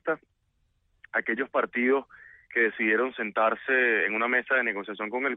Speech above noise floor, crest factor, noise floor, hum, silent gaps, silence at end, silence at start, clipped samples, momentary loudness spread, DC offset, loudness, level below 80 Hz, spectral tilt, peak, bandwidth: 45 dB; 16 dB; -72 dBFS; none; none; 0 s; 0.05 s; under 0.1%; 8 LU; under 0.1%; -26 LUFS; -74 dBFS; -7.5 dB/octave; -12 dBFS; 4 kHz